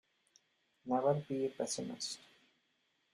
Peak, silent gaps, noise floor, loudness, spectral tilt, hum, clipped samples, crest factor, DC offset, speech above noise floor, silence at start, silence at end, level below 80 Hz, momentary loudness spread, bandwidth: -20 dBFS; none; -79 dBFS; -37 LUFS; -4.5 dB/octave; none; under 0.1%; 20 dB; under 0.1%; 42 dB; 0.85 s; 0.95 s; -80 dBFS; 12 LU; 14.5 kHz